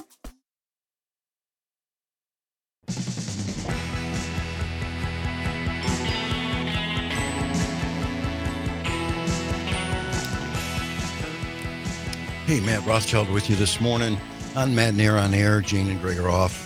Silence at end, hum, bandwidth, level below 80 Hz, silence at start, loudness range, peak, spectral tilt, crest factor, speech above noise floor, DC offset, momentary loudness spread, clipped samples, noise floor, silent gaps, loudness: 0 s; none; 16 kHz; -40 dBFS; 0 s; 10 LU; -2 dBFS; -5 dB/octave; 24 dB; over 68 dB; under 0.1%; 10 LU; under 0.1%; under -90 dBFS; none; -25 LUFS